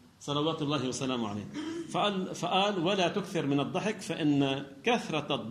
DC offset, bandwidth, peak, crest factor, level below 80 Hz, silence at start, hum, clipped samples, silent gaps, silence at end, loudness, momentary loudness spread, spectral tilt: under 0.1%; 13.5 kHz; -14 dBFS; 18 dB; -70 dBFS; 0.2 s; none; under 0.1%; none; 0 s; -31 LUFS; 7 LU; -5 dB/octave